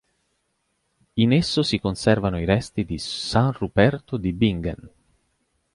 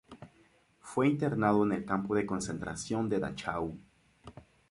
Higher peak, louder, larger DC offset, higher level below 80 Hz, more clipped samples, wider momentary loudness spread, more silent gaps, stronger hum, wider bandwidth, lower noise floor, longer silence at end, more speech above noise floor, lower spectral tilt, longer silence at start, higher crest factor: first, -2 dBFS vs -12 dBFS; first, -22 LUFS vs -32 LUFS; neither; first, -42 dBFS vs -60 dBFS; neither; second, 9 LU vs 12 LU; neither; neither; about the same, 11.5 kHz vs 11.5 kHz; first, -72 dBFS vs -65 dBFS; first, 0.85 s vs 0.3 s; first, 51 dB vs 34 dB; about the same, -6 dB/octave vs -6 dB/octave; first, 1.15 s vs 0.1 s; about the same, 20 dB vs 20 dB